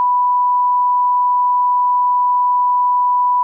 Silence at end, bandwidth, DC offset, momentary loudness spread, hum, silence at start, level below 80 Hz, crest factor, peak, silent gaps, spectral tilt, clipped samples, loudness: 0 s; 1.2 kHz; under 0.1%; 0 LU; none; 0 s; under -90 dBFS; 4 dB; -10 dBFS; none; 8 dB/octave; under 0.1%; -14 LUFS